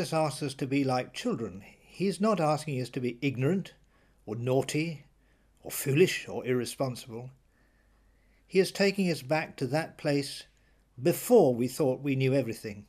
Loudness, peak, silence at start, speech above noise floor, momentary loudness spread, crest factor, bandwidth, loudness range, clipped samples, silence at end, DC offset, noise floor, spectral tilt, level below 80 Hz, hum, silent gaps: -29 LUFS; -10 dBFS; 0 s; 36 dB; 14 LU; 20 dB; 15.5 kHz; 4 LU; under 0.1%; 0.05 s; under 0.1%; -65 dBFS; -5.5 dB/octave; -66 dBFS; none; none